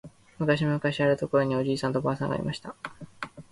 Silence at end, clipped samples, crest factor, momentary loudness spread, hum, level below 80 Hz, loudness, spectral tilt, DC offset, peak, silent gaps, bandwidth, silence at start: 0.1 s; under 0.1%; 18 dB; 15 LU; none; -58 dBFS; -27 LUFS; -7 dB/octave; under 0.1%; -10 dBFS; none; 11.5 kHz; 0.05 s